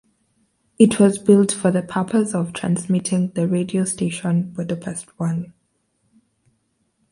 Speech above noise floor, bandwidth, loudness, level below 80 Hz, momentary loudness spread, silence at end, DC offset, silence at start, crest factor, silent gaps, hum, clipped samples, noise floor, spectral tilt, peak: 49 dB; 11.5 kHz; -20 LUFS; -60 dBFS; 12 LU; 1.6 s; under 0.1%; 0.8 s; 20 dB; none; none; under 0.1%; -68 dBFS; -6 dB/octave; 0 dBFS